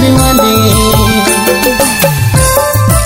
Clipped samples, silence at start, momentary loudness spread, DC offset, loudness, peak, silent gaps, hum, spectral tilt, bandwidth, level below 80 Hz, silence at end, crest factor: 1%; 0 s; 2 LU; under 0.1%; -8 LUFS; 0 dBFS; none; none; -4 dB/octave; over 20 kHz; -20 dBFS; 0 s; 8 dB